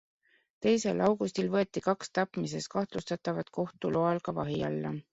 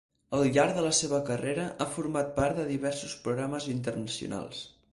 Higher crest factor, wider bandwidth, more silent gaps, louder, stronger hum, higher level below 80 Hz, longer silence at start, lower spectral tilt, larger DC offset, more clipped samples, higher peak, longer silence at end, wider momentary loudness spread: about the same, 18 dB vs 18 dB; second, 8.2 kHz vs 11.5 kHz; neither; about the same, -31 LUFS vs -30 LUFS; neither; second, -66 dBFS vs -56 dBFS; first, 0.6 s vs 0.3 s; first, -6 dB/octave vs -4.5 dB/octave; neither; neither; about the same, -12 dBFS vs -12 dBFS; second, 0.1 s vs 0.25 s; second, 7 LU vs 10 LU